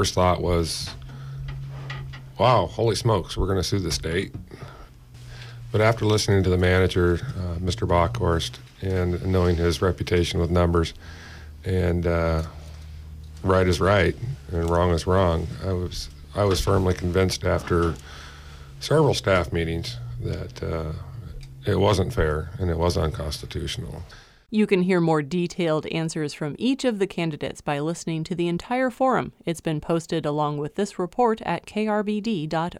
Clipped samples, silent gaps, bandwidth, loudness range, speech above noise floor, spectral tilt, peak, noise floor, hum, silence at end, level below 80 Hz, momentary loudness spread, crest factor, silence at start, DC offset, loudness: under 0.1%; none; 15 kHz; 3 LU; 21 dB; -6 dB/octave; -6 dBFS; -44 dBFS; none; 0 s; -38 dBFS; 17 LU; 18 dB; 0 s; under 0.1%; -24 LUFS